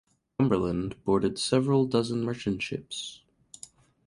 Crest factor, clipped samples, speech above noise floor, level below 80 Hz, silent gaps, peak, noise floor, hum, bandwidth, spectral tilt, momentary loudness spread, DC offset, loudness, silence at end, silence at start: 18 dB; under 0.1%; 25 dB; -54 dBFS; none; -10 dBFS; -52 dBFS; none; 11.5 kHz; -6 dB/octave; 20 LU; under 0.1%; -28 LUFS; 0.9 s; 0.4 s